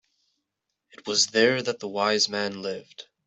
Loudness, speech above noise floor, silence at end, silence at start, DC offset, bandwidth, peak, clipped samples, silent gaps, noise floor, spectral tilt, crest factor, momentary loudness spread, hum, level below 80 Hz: -24 LUFS; 57 dB; 0.25 s; 1.05 s; under 0.1%; 8.2 kHz; -6 dBFS; under 0.1%; none; -82 dBFS; -2 dB/octave; 20 dB; 17 LU; none; -72 dBFS